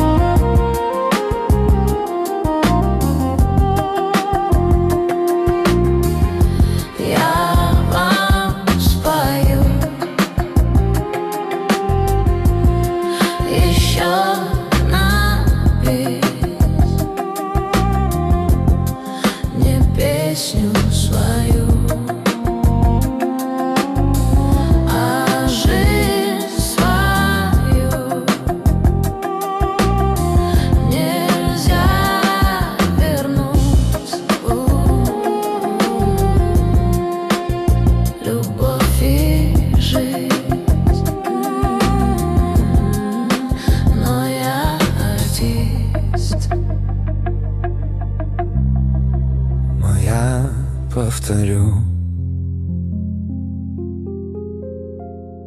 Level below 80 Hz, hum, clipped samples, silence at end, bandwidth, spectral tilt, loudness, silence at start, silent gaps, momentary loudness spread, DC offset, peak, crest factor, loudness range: -20 dBFS; none; under 0.1%; 0 s; 15 kHz; -6 dB/octave; -17 LUFS; 0 s; none; 6 LU; under 0.1%; -2 dBFS; 14 dB; 3 LU